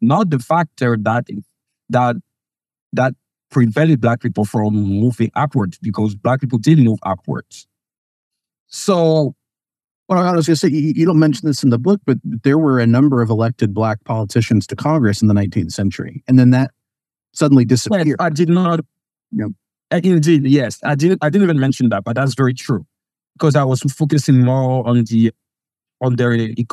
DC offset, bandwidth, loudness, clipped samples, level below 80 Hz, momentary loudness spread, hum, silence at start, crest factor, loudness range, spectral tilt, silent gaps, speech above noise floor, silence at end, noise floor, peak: under 0.1%; 13 kHz; -16 LUFS; under 0.1%; -58 dBFS; 9 LU; none; 0 s; 14 dB; 4 LU; -7 dB/octave; 2.81-2.91 s, 7.98-8.31 s, 8.60-8.66 s, 9.91-10.04 s; 74 dB; 0.05 s; -89 dBFS; 0 dBFS